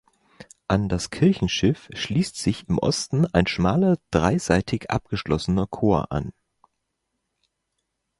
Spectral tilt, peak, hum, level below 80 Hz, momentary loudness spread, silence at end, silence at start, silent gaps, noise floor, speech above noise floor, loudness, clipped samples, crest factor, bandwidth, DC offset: -6 dB/octave; -4 dBFS; none; -42 dBFS; 6 LU; 1.9 s; 0.4 s; none; -78 dBFS; 56 dB; -23 LUFS; under 0.1%; 20 dB; 11.5 kHz; under 0.1%